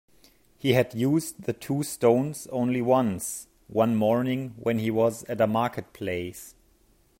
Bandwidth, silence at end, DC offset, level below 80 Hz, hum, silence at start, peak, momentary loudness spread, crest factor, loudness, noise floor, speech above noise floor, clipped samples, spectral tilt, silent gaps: 16.5 kHz; 0.7 s; under 0.1%; -62 dBFS; none; 0.65 s; -8 dBFS; 10 LU; 20 dB; -26 LUFS; -62 dBFS; 37 dB; under 0.1%; -6 dB/octave; none